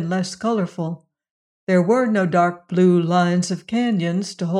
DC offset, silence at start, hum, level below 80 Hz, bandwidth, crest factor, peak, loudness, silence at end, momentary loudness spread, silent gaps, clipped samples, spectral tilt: under 0.1%; 0 s; none; -66 dBFS; 10.5 kHz; 14 dB; -4 dBFS; -20 LUFS; 0 s; 10 LU; 1.31-1.67 s; under 0.1%; -6.5 dB/octave